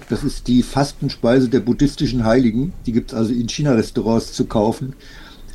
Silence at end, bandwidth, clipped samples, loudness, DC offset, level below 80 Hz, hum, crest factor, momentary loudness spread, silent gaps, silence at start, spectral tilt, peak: 0 s; 12.5 kHz; under 0.1%; -18 LUFS; under 0.1%; -34 dBFS; none; 14 dB; 7 LU; none; 0 s; -6.5 dB/octave; -4 dBFS